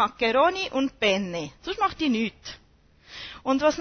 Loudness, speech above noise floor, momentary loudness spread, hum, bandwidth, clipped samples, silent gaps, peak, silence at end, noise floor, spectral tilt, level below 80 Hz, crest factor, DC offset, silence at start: -25 LUFS; 32 dB; 18 LU; none; 6.6 kHz; under 0.1%; none; -8 dBFS; 0 s; -57 dBFS; -4 dB/octave; -54 dBFS; 18 dB; under 0.1%; 0 s